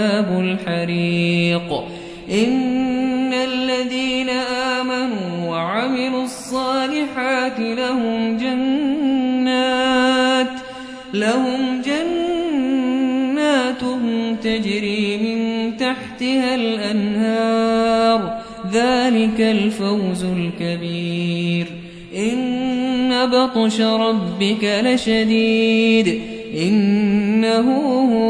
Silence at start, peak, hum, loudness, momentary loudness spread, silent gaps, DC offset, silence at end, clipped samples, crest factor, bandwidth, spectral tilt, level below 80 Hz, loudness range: 0 s; -4 dBFS; none; -18 LUFS; 7 LU; none; under 0.1%; 0 s; under 0.1%; 16 dB; 11 kHz; -5.5 dB/octave; -52 dBFS; 4 LU